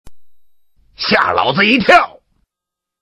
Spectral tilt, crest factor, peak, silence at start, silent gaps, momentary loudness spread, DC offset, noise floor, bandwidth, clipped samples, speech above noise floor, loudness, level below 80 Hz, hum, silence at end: -5 dB/octave; 16 dB; 0 dBFS; 0.05 s; none; 11 LU; under 0.1%; -83 dBFS; 13 kHz; under 0.1%; 71 dB; -12 LUFS; -48 dBFS; none; 0.95 s